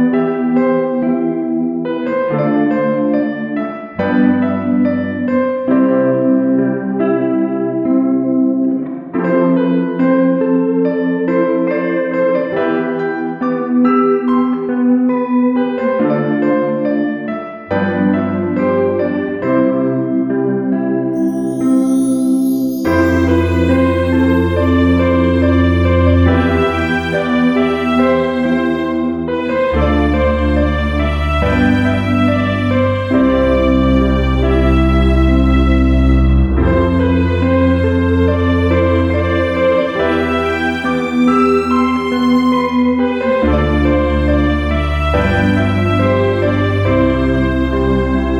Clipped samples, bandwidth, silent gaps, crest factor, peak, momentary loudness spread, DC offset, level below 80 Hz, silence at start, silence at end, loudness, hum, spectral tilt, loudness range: under 0.1%; 13 kHz; none; 12 dB; 0 dBFS; 5 LU; under 0.1%; -24 dBFS; 0 s; 0 s; -14 LUFS; none; -8 dB/octave; 3 LU